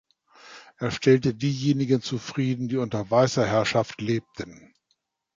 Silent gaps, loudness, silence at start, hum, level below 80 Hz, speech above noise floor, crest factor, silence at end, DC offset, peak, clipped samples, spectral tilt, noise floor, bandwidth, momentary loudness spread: none; -24 LUFS; 0.45 s; none; -58 dBFS; 50 dB; 18 dB; 0.85 s; under 0.1%; -6 dBFS; under 0.1%; -6 dB/octave; -74 dBFS; 7.6 kHz; 10 LU